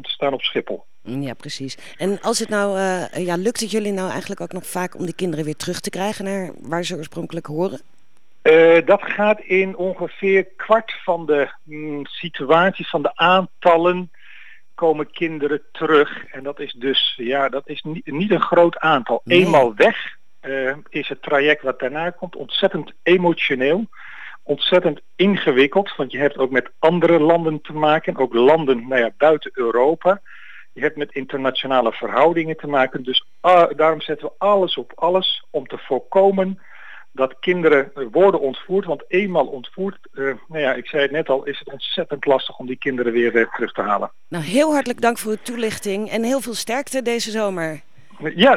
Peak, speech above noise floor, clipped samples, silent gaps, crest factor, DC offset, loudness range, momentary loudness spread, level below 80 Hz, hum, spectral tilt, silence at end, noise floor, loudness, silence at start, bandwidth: -2 dBFS; 45 dB; under 0.1%; none; 18 dB; 1%; 6 LU; 13 LU; -70 dBFS; none; -4.5 dB/octave; 0 s; -63 dBFS; -19 LUFS; 0.05 s; 16 kHz